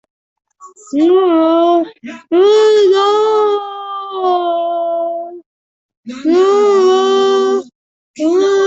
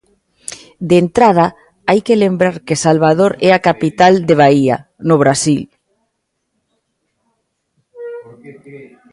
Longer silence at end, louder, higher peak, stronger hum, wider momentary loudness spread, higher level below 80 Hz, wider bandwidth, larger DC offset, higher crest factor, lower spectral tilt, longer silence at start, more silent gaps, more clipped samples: second, 0 s vs 0.3 s; about the same, -12 LUFS vs -12 LUFS; about the same, -2 dBFS vs 0 dBFS; neither; second, 13 LU vs 20 LU; second, -64 dBFS vs -52 dBFS; second, 8 kHz vs 11.5 kHz; neither; about the same, 10 dB vs 14 dB; second, -3.5 dB/octave vs -5.5 dB/octave; about the same, 0.6 s vs 0.5 s; first, 5.46-5.89 s, 5.97-6.03 s, 7.75-8.14 s vs none; neither